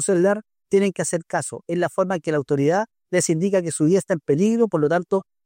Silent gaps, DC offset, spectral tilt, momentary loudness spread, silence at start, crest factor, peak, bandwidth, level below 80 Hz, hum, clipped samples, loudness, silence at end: none; under 0.1%; -5.5 dB/octave; 6 LU; 0 s; 14 dB; -6 dBFS; 16 kHz; -66 dBFS; none; under 0.1%; -21 LUFS; 0.25 s